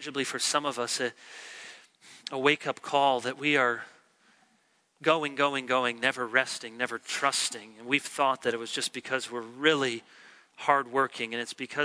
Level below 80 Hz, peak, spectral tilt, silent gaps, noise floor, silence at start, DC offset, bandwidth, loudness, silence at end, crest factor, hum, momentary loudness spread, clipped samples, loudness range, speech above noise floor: -84 dBFS; -8 dBFS; -2.5 dB/octave; none; -69 dBFS; 0 s; under 0.1%; 11 kHz; -28 LUFS; 0 s; 22 dB; none; 12 LU; under 0.1%; 1 LU; 40 dB